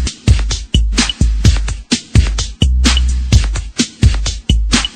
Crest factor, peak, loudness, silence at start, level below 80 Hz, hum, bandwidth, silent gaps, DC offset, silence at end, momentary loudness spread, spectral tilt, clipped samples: 12 dB; 0 dBFS; -14 LUFS; 0 s; -14 dBFS; none; 9.6 kHz; none; under 0.1%; 0 s; 6 LU; -4 dB/octave; under 0.1%